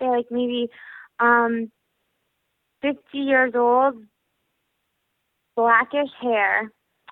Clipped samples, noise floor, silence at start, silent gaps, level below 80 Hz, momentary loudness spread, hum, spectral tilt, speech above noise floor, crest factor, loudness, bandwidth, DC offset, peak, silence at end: under 0.1%; -75 dBFS; 0 s; none; -68 dBFS; 14 LU; none; -7 dB/octave; 54 dB; 20 dB; -21 LUFS; 4.1 kHz; under 0.1%; -4 dBFS; 0.45 s